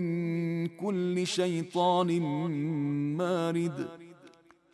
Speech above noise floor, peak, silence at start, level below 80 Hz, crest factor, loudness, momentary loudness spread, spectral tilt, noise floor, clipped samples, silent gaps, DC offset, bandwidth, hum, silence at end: 28 dB; -16 dBFS; 0 s; -76 dBFS; 14 dB; -30 LUFS; 6 LU; -6.5 dB/octave; -58 dBFS; under 0.1%; none; under 0.1%; 12 kHz; none; 0.45 s